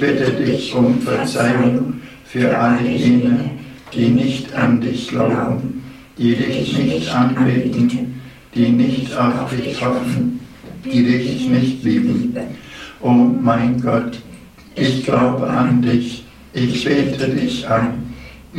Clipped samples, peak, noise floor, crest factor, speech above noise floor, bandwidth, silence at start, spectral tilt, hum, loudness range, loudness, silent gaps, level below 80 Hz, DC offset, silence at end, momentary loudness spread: under 0.1%; -2 dBFS; -39 dBFS; 16 dB; 23 dB; 12 kHz; 0 s; -7 dB/octave; none; 2 LU; -17 LUFS; none; -46 dBFS; under 0.1%; 0 s; 13 LU